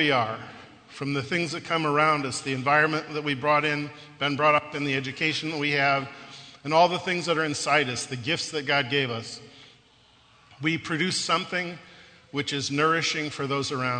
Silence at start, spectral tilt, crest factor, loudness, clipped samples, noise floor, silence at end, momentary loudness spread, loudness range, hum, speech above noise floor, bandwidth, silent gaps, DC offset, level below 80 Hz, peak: 0 s; -4 dB/octave; 20 dB; -25 LUFS; under 0.1%; -58 dBFS; 0 s; 13 LU; 4 LU; none; 32 dB; 9.4 kHz; none; under 0.1%; -68 dBFS; -6 dBFS